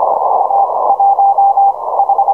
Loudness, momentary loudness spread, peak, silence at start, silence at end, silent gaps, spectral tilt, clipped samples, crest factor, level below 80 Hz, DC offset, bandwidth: -11 LUFS; 3 LU; -2 dBFS; 0 s; 0 s; none; -7 dB/octave; under 0.1%; 10 dB; -58 dBFS; 0.3%; 1.5 kHz